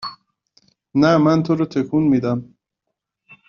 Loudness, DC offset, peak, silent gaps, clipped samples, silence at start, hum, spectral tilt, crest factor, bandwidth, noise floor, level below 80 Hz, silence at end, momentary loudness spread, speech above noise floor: -18 LUFS; under 0.1%; -2 dBFS; none; under 0.1%; 0 s; none; -6.5 dB/octave; 18 dB; 7 kHz; -79 dBFS; -56 dBFS; 0.15 s; 10 LU; 63 dB